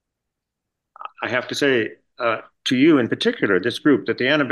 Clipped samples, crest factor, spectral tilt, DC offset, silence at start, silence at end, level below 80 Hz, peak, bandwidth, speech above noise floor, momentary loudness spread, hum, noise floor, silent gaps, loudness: under 0.1%; 16 dB; -5 dB/octave; under 0.1%; 1 s; 0 s; -68 dBFS; -4 dBFS; 12.5 kHz; 62 dB; 12 LU; none; -82 dBFS; none; -20 LUFS